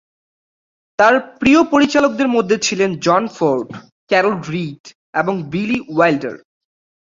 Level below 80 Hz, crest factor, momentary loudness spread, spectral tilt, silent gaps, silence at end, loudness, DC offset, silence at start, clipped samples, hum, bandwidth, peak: -52 dBFS; 16 dB; 11 LU; -5 dB/octave; 3.92-4.07 s, 4.80-4.84 s, 4.95-5.13 s; 0.7 s; -16 LUFS; under 0.1%; 1 s; under 0.1%; none; 7.6 kHz; -2 dBFS